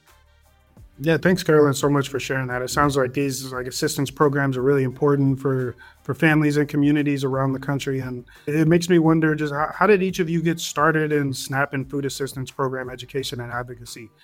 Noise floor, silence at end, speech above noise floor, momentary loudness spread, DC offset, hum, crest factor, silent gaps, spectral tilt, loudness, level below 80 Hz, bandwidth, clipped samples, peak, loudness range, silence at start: -56 dBFS; 0.15 s; 35 dB; 12 LU; under 0.1%; none; 18 dB; none; -6 dB/octave; -21 LUFS; -50 dBFS; 17 kHz; under 0.1%; -4 dBFS; 4 LU; 0.8 s